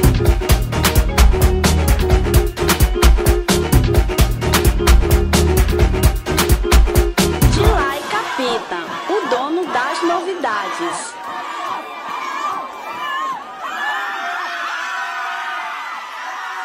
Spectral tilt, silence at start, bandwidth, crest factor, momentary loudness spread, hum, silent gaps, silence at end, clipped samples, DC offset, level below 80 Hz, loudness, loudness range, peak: -5 dB/octave; 0 s; 16.5 kHz; 16 dB; 11 LU; none; none; 0 s; under 0.1%; under 0.1%; -18 dBFS; -17 LUFS; 8 LU; 0 dBFS